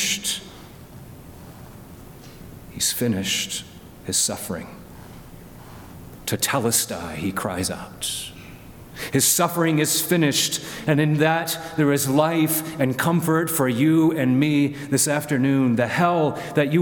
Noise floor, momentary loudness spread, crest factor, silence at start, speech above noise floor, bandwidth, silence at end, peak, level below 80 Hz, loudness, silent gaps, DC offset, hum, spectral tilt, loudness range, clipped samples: -42 dBFS; 23 LU; 18 dB; 0 s; 21 dB; 19 kHz; 0 s; -4 dBFS; -52 dBFS; -21 LUFS; none; under 0.1%; none; -4 dB/octave; 8 LU; under 0.1%